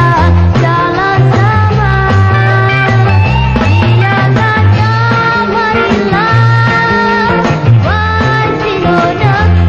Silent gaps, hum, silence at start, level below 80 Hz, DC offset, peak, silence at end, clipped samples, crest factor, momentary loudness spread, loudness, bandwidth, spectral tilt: none; none; 0 s; -24 dBFS; under 0.1%; 0 dBFS; 0 s; under 0.1%; 8 dB; 2 LU; -9 LUFS; 7.2 kHz; -7.5 dB/octave